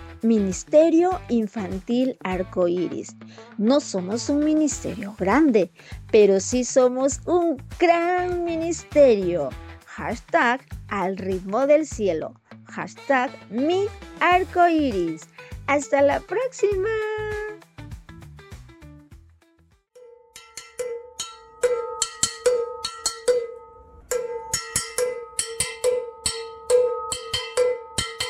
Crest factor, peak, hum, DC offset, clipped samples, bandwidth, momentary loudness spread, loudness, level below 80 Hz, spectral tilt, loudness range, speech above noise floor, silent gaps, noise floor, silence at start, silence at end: 18 dB; -6 dBFS; none; under 0.1%; under 0.1%; 15.5 kHz; 16 LU; -23 LUFS; -48 dBFS; -4 dB/octave; 9 LU; 39 dB; none; -60 dBFS; 0 s; 0 s